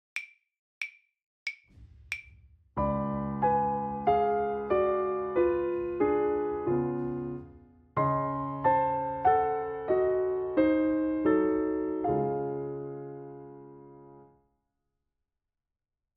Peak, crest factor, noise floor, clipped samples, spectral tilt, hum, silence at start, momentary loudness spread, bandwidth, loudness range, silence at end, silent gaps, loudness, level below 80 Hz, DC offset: -12 dBFS; 18 dB; -88 dBFS; under 0.1%; -8.5 dB/octave; none; 0.15 s; 14 LU; 9 kHz; 9 LU; 1.95 s; 0.59-0.81 s, 1.26-1.46 s; -29 LUFS; -54 dBFS; under 0.1%